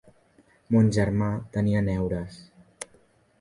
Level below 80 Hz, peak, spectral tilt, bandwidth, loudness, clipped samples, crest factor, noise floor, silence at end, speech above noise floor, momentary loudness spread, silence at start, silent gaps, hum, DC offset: -46 dBFS; -10 dBFS; -7.5 dB/octave; 11.5 kHz; -25 LUFS; under 0.1%; 18 dB; -61 dBFS; 0.55 s; 37 dB; 20 LU; 0.7 s; none; none; under 0.1%